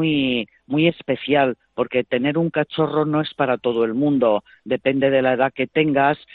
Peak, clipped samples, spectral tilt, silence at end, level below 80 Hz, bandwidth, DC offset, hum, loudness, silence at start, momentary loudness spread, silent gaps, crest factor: -4 dBFS; under 0.1%; -10 dB/octave; 0.2 s; -60 dBFS; 4.6 kHz; under 0.1%; none; -20 LUFS; 0 s; 5 LU; none; 16 dB